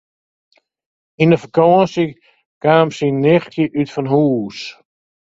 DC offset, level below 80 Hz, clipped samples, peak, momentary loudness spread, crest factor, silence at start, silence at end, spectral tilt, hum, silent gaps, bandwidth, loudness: under 0.1%; -56 dBFS; under 0.1%; 0 dBFS; 9 LU; 16 dB; 1.2 s; 0.55 s; -7.5 dB/octave; none; 2.46-2.61 s; 7.8 kHz; -15 LUFS